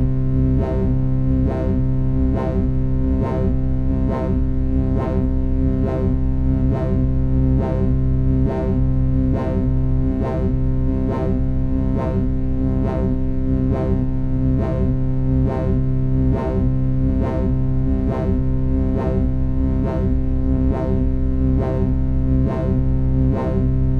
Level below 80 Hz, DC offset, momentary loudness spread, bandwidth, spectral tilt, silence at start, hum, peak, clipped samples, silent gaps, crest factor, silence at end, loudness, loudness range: -22 dBFS; under 0.1%; 2 LU; 4.3 kHz; -11.5 dB/octave; 0 s; none; -6 dBFS; under 0.1%; none; 12 dB; 0 s; -20 LUFS; 1 LU